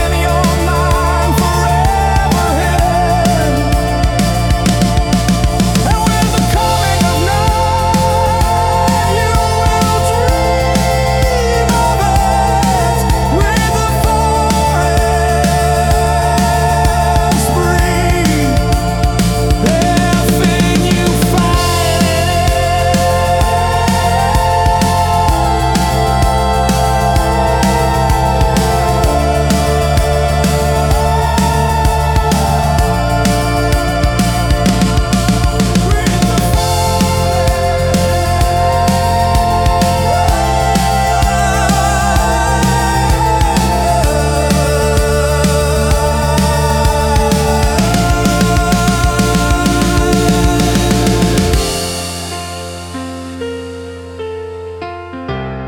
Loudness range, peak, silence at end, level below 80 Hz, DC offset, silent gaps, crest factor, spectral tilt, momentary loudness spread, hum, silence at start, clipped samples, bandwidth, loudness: 1 LU; 0 dBFS; 0 s; -18 dBFS; under 0.1%; none; 10 dB; -5 dB/octave; 2 LU; none; 0 s; under 0.1%; 18 kHz; -12 LUFS